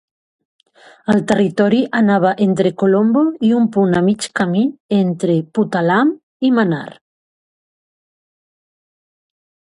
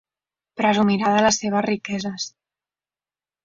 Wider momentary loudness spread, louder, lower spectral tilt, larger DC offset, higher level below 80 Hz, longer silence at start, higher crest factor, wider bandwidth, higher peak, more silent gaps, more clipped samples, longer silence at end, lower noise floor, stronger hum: second, 5 LU vs 13 LU; first, -15 LUFS vs -21 LUFS; first, -7 dB/octave vs -4 dB/octave; neither; about the same, -58 dBFS vs -60 dBFS; first, 1.1 s vs 0.55 s; about the same, 16 dB vs 20 dB; first, 11.5 kHz vs 7.6 kHz; first, 0 dBFS vs -4 dBFS; first, 4.80-4.89 s, 6.23-6.40 s vs none; neither; first, 2.8 s vs 1.15 s; about the same, under -90 dBFS vs under -90 dBFS; second, none vs 50 Hz at -40 dBFS